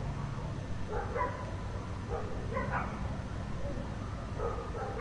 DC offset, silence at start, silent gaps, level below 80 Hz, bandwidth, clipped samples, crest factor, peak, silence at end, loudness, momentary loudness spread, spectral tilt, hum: under 0.1%; 0 s; none; -42 dBFS; 11 kHz; under 0.1%; 16 dB; -20 dBFS; 0 s; -38 LUFS; 5 LU; -7 dB/octave; none